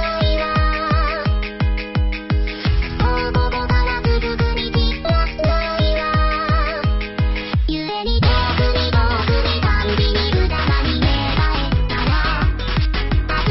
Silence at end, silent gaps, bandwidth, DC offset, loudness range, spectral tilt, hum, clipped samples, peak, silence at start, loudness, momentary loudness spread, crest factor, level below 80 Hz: 0 s; none; 6 kHz; under 0.1%; 2 LU; -4.5 dB/octave; none; under 0.1%; -4 dBFS; 0 s; -19 LUFS; 4 LU; 12 dB; -20 dBFS